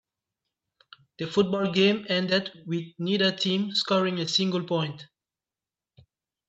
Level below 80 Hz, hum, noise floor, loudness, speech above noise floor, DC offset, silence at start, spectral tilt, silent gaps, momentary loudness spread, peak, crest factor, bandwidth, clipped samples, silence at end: -70 dBFS; none; under -90 dBFS; -25 LUFS; over 64 dB; under 0.1%; 1.2 s; -5 dB/octave; none; 10 LU; -8 dBFS; 20 dB; 8 kHz; under 0.1%; 1.45 s